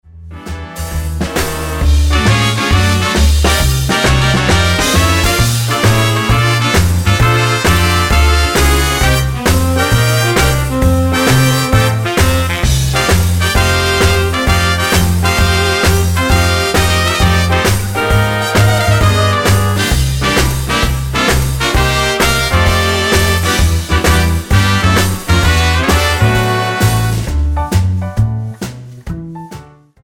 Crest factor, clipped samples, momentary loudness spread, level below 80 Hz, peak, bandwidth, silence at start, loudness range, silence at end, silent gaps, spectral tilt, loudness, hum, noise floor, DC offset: 12 dB; under 0.1%; 6 LU; -18 dBFS; 0 dBFS; 17 kHz; 0.15 s; 2 LU; 0.4 s; none; -4.5 dB/octave; -12 LUFS; none; -34 dBFS; under 0.1%